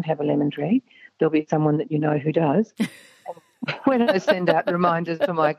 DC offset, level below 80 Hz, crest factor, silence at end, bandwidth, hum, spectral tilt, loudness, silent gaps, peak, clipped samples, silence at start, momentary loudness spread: under 0.1%; -70 dBFS; 18 dB; 0.05 s; 13 kHz; none; -7.5 dB/octave; -22 LUFS; none; -4 dBFS; under 0.1%; 0 s; 11 LU